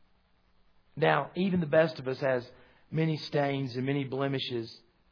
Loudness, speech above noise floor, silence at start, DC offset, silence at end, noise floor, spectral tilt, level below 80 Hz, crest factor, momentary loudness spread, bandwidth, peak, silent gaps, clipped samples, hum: -30 LUFS; 38 dB; 0.95 s; under 0.1%; 0.35 s; -67 dBFS; -8 dB/octave; -68 dBFS; 22 dB; 9 LU; 5.4 kHz; -10 dBFS; none; under 0.1%; none